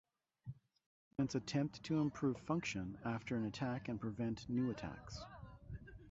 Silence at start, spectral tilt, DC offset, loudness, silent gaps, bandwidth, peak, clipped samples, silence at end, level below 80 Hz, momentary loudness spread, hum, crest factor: 0.45 s; -6 dB/octave; under 0.1%; -42 LUFS; 0.86-1.11 s; 8 kHz; -24 dBFS; under 0.1%; 0 s; -64 dBFS; 16 LU; none; 18 dB